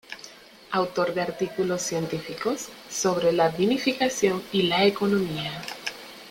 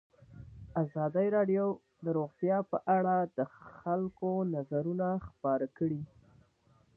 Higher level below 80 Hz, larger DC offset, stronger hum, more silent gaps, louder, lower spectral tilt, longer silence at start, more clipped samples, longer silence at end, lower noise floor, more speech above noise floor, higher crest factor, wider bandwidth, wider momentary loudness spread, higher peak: about the same, -62 dBFS vs -64 dBFS; neither; neither; neither; first, -25 LUFS vs -33 LUFS; second, -4 dB/octave vs -11.5 dB/octave; second, 0.1 s vs 0.3 s; neither; second, 0 s vs 0.9 s; second, -47 dBFS vs -67 dBFS; second, 22 dB vs 36 dB; about the same, 18 dB vs 16 dB; first, 17 kHz vs 3.1 kHz; about the same, 12 LU vs 11 LU; first, -6 dBFS vs -16 dBFS